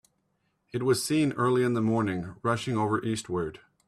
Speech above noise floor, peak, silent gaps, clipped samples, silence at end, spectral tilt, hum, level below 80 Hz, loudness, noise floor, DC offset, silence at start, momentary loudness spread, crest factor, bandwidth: 48 dB; -12 dBFS; none; under 0.1%; 0.3 s; -5.5 dB/octave; none; -62 dBFS; -28 LUFS; -75 dBFS; under 0.1%; 0.75 s; 8 LU; 16 dB; 14.5 kHz